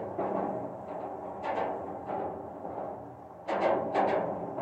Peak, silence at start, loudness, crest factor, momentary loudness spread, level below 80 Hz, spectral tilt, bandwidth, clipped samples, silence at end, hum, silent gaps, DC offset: -16 dBFS; 0 s; -34 LUFS; 18 dB; 12 LU; -68 dBFS; -7.5 dB/octave; 8.6 kHz; under 0.1%; 0 s; none; none; under 0.1%